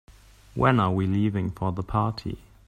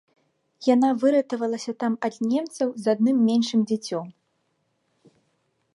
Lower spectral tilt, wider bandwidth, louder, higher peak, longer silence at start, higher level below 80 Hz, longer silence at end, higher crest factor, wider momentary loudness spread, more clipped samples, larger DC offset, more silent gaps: first, -8.5 dB/octave vs -5.5 dB/octave; second, 9.6 kHz vs 11.5 kHz; about the same, -25 LUFS vs -23 LUFS; about the same, -6 dBFS vs -8 dBFS; second, 0.1 s vs 0.6 s; first, -46 dBFS vs -78 dBFS; second, 0.3 s vs 1.65 s; about the same, 20 dB vs 18 dB; first, 14 LU vs 8 LU; neither; neither; neither